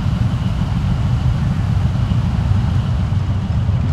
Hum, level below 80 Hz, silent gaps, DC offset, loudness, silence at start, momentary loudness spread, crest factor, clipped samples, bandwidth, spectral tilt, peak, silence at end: none; -24 dBFS; none; under 0.1%; -18 LUFS; 0 s; 2 LU; 12 dB; under 0.1%; 8.8 kHz; -8 dB/octave; -4 dBFS; 0 s